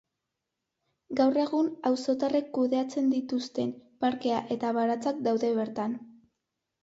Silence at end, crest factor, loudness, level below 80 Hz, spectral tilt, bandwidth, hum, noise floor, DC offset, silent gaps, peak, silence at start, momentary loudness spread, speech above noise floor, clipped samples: 0.75 s; 16 dB; -29 LUFS; -74 dBFS; -5.5 dB/octave; 8 kHz; none; -85 dBFS; under 0.1%; none; -12 dBFS; 1.1 s; 7 LU; 57 dB; under 0.1%